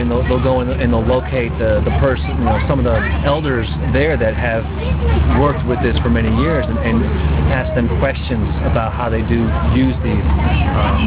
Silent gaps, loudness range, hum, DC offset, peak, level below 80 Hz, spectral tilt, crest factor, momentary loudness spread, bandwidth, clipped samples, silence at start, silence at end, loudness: none; 1 LU; none; under 0.1%; 0 dBFS; -20 dBFS; -11.5 dB/octave; 14 dB; 4 LU; 4 kHz; under 0.1%; 0 s; 0 s; -16 LUFS